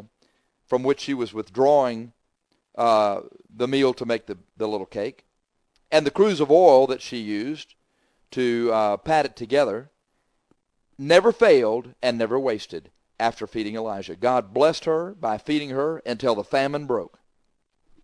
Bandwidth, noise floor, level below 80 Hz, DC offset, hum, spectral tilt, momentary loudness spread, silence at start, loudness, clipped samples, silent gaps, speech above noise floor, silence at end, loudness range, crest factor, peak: 10.5 kHz; -72 dBFS; -62 dBFS; under 0.1%; none; -5.5 dB/octave; 14 LU; 0.7 s; -22 LUFS; under 0.1%; none; 50 dB; 0.95 s; 4 LU; 22 dB; -2 dBFS